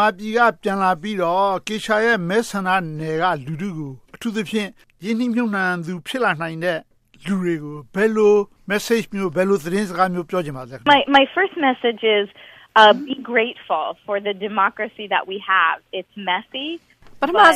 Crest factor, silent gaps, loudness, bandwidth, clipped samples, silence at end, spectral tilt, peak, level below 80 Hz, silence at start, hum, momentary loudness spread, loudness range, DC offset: 18 dB; none; -20 LUFS; 15 kHz; under 0.1%; 0 s; -5 dB/octave; 0 dBFS; -58 dBFS; 0 s; none; 13 LU; 6 LU; under 0.1%